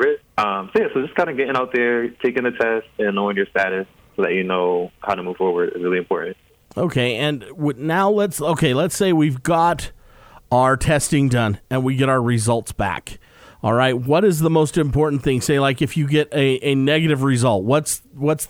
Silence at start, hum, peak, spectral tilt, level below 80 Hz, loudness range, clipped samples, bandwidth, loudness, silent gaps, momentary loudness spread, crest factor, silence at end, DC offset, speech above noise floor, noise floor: 0 s; none; -4 dBFS; -5.5 dB/octave; -44 dBFS; 3 LU; under 0.1%; 19.5 kHz; -19 LUFS; none; 7 LU; 16 dB; 0.05 s; under 0.1%; 28 dB; -46 dBFS